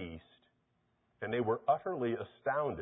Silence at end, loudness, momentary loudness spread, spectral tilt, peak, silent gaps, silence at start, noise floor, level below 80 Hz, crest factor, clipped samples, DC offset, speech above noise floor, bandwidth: 0 s; -35 LUFS; 13 LU; -2.5 dB/octave; -18 dBFS; none; 0 s; -77 dBFS; -64 dBFS; 18 dB; under 0.1%; under 0.1%; 43 dB; 3.8 kHz